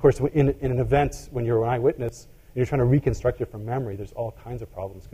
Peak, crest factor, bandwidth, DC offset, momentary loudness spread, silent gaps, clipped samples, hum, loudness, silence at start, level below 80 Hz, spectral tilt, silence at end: -6 dBFS; 18 dB; 15 kHz; under 0.1%; 14 LU; none; under 0.1%; none; -25 LUFS; 0 s; -40 dBFS; -8 dB/octave; 0.05 s